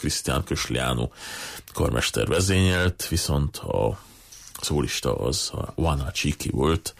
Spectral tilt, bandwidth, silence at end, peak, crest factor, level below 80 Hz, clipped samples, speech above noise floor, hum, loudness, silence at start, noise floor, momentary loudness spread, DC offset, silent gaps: -4.5 dB/octave; 15.5 kHz; 0.05 s; -12 dBFS; 14 dB; -36 dBFS; under 0.1%; 19 dB; none; -25 LUFS; 0 s; -44 dBFS; 12 LU; under 0.1%; none